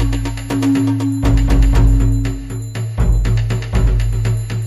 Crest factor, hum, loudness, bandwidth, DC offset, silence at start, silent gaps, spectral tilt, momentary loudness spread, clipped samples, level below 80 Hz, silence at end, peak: 12 dB; none; -17 LUFS; 12 kHz; under 0.1%; 0 s; none; -7 dB/octave; 9 LU; under 0.1%; -16 dBFS; 0 s; -2 dBFS